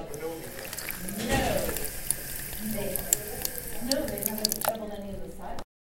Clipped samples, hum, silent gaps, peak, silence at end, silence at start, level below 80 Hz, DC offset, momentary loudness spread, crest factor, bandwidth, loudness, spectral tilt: under 0.1%; none; none; 0 dBFS; 0.3 s; 0 s; -42 dBFS; under 0.1%; 13 LU; 32 dB; 17 kHz; -30 LUFS; -3 dB/octave